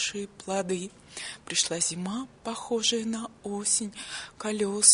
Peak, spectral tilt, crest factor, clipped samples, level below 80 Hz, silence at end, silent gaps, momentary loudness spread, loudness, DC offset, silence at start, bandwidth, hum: -4 dBFS; -1.5 dB/octave; 26 dB; under 0.1%; -64 dBFS; 0 s; none; 12 LU; -29 LUFS; under 0.1%; 0 s; 11 kHz; none